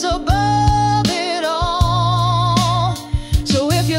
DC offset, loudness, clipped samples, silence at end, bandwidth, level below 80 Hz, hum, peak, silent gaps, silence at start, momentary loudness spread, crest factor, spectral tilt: under 0.1%; -17 LUFS; under 0.1%; 0 s; 16 kHz; -26 dBFS; none; -4 dBFS; none; 0 s; 5 LU; 12 dB; -5 dB/octave